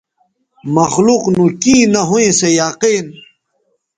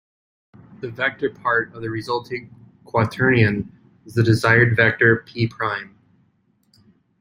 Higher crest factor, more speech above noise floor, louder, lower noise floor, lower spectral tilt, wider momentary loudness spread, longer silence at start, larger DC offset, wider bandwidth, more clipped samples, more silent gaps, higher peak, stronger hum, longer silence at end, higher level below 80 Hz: second, 14 dB vs 20 dB; first, 52 dB vs 44 dB; first, -12 LUFS vs -19 LUFS; about the same, -64 dBFS vs -63 dBFS; second, -4 dB/octave vs -7 dB/octave; second, 8 LU vs 15 LU; about the same, 0.65 s vs 0.7 s; neither; second, 9.6 kHz vs 15.5 kHz; neither; neither; about the same, 0 dBFS vs -2 dBFS; neither; second, 0.85 s vs 1.35 s; about the same, -50 dBFS vs -54 dBFS